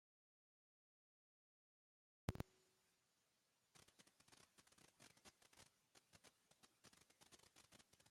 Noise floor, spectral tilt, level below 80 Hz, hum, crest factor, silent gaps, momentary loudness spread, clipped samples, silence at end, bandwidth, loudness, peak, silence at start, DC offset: -86 dBFS; -5 dB/octave; -76 dBFS; none; 36 dB; none; 17 LU; under 0.1%; 0 s; 16 kHz; -60 LUFS; -28 dBFS; 2.3 s; under 0.1%